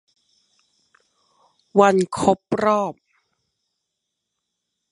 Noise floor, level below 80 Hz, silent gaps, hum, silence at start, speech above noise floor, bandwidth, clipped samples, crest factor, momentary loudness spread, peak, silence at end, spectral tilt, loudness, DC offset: -80 dBFS; -60 dBFS; none; none; 1.75 s; 62 dB; 11.5 kHz; under 0.1%; 22 dB; 7 LU; -2 dBFS; 2 s; -6 dB/octave; -19 LUFS; under 0.1%